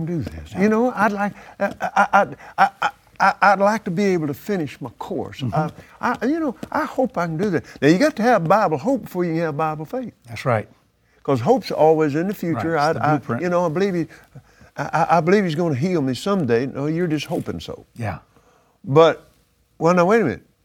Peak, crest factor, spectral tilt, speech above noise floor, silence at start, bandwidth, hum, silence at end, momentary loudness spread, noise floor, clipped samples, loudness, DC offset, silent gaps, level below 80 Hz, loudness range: 0 dBFS; 20 dB; -6.5 dB/octave; 40 dB; 0 s; 19.5 kHz; none; 0.25 s; 14 LU; -60 dBFS; under 0.1%; -20 LUFS; under 0.1%; none; -54 dBFS; 4 LU